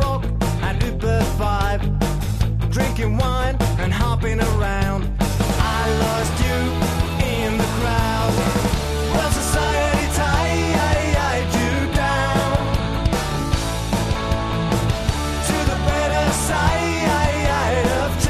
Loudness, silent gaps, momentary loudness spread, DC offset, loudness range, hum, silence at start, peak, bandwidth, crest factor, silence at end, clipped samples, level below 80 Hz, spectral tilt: -20 LUFS; none; 3 LU; under 0.1%; 2 LU; none; 0 s; -4 dBFS; 14 kHz; 16 dB; 0 s; under 0.1%; -24 dBFS; -5 dB/octave